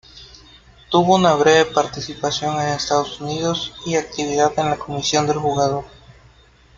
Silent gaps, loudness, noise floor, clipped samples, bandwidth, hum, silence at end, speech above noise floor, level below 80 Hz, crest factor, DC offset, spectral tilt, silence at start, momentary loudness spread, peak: none; -19 LUFS; -50 dBFS; under 0.1%; 7.6 kHz; none; 0.9 s; 32 dB; -50 dBFS; 18 dB; under 0.1%; -4 dB/octave; 0.15 s; 9 LU; -2 dBFS